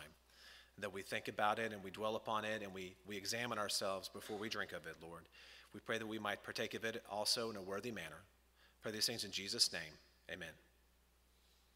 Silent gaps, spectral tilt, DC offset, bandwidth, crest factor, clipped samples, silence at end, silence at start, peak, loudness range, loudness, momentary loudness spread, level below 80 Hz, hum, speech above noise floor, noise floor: none; -2 dB/octave; under 0.1%; 16 kHz; 26 dB; under 0.1%; 1.15 s; 0 s; -18 dBFS; 4 LU; -42 LUFS; 19 LU; -74 dBFS; none; 29 dB; -73 dBFS